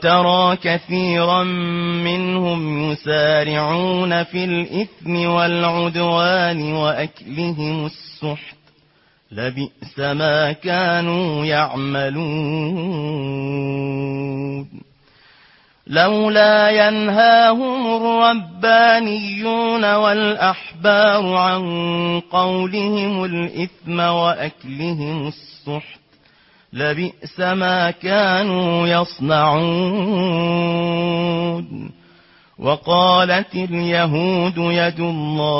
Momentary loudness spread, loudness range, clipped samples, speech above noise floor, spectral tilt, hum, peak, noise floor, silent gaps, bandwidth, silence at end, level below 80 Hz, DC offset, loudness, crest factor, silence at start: 12 LU; 9 LU; under 0.1%; 39 dB; -9 dB/octave; none; -2 dBFS; -57 dBFS; none; 5.8 kHz; 0 s; -56 dBFS; under 0.1%; -18 LUFS; 16 dB; 0 s